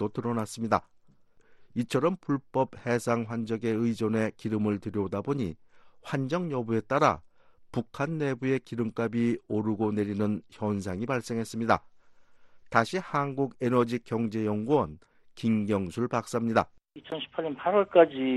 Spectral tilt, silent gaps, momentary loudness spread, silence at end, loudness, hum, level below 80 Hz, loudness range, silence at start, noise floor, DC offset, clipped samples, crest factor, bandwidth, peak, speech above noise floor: -7 dB/octave; none; 7 LU; 0 s; -29 LUFS; none; -62 dBFS; 2 LU; 0 s; -59 dBFS; under 0.1%; under 0.1%; 24 dB; 12.5 kHz; -6 dBFS; 30 dB